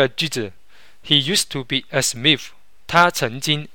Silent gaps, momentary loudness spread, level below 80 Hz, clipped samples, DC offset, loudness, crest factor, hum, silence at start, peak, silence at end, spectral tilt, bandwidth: none; 8 LU; -54 dBFS; under 0.1%; 1%; -18 LUFS; 20 dB; none; 0 s; 0 dBFS; 0.1 s; -3 dB/octave; 17 kHz